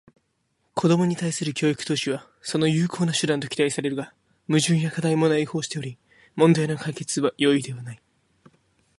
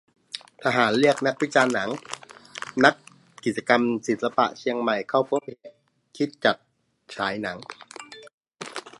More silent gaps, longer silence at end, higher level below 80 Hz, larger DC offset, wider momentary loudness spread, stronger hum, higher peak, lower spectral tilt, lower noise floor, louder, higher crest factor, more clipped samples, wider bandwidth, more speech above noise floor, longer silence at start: second, none vs 8.33-8.41 s; first, 1.05 s vs 0.1 s; first, -64 dBFS vs -70 dBFS; neither; second, 12 LU vs 20 LU; neither; second, -4 dBFS vs 0 dBFS; about the same, -5 dB/octave vs -4.5 dB/octave; first, -71 dBFS vs -44 dBFS; about the same, -23 LUFS vs -24 LUFS; about the same, 20 dB vs 24 dB; neither; about the same, 11.5 kHz vs 11.5 kHz; first, 49 dB vs 20 dB; first, 0.75 s vs 0.35 s